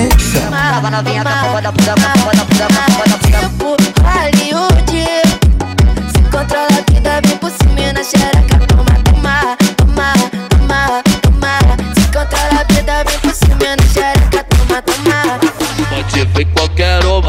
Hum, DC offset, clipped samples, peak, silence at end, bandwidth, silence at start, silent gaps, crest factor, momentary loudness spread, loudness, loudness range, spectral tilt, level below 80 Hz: none; under 0.1%; under 0.1%; 0 dBFS; 0 s; 16.5 kHz; 0 s; none; 10 dB; 4 LU; -11 LUFS; 1 LU; -5 dB/octave; -14 dBFS